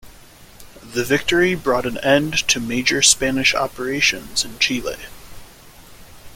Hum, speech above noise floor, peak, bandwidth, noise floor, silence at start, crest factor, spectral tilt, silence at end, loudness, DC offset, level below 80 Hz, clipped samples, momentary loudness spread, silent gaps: none; 25 dB; 0 dBFS; 17 kHz; -44 dBFS; 0.05 s; 20 dB; -2 dB/octave; 0 s; -18 LUFS; under 0.1%; -44 dBFS; under 0.1%; 12 LU; none